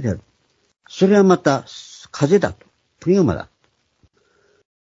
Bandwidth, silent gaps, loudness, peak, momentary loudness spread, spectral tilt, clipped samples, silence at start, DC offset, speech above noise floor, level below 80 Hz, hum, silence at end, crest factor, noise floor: 7.8 kHz; none; -17 LUFS; 0 dBFS; 22 LU; -6.5 dB/octave; under 0.1%; 0 s; under 0.1%; 48 dB; -50 dBFS; none; 1.4 s; 20 dB; -65 dBFS